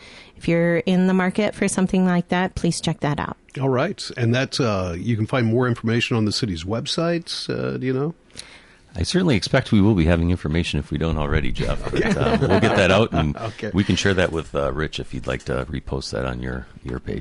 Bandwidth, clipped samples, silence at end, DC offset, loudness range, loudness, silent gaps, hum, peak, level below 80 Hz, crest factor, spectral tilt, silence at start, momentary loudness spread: 11.5 kHz; under 0.1%; 0 s; under 0.1%; 4 LU; -21 LUFS; none; none; -6 dBFS; -34 dBFS; 16 dB; -6 dB/octave; 0 s; 10 LU